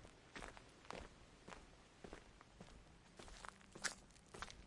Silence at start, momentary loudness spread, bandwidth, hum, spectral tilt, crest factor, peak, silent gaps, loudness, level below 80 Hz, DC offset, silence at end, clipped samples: 0 s; 16 LU; 12 kHz; none; -2 dB/octave; 32 dB; -26 dBFS; none; -56 LUFS; -66 dBFS; under 0.1%; 0 s; under 0.1%